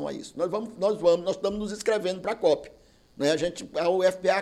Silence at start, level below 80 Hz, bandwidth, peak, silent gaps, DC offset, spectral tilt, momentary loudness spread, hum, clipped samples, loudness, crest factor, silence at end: 0 s; -58 dBFS; 13 kHz; -10 dBFS; none; under 0.1%; -4.5 dB/octave; 7 LU; none; under 0.1%; -26 LUFS; 16 dB; 0 s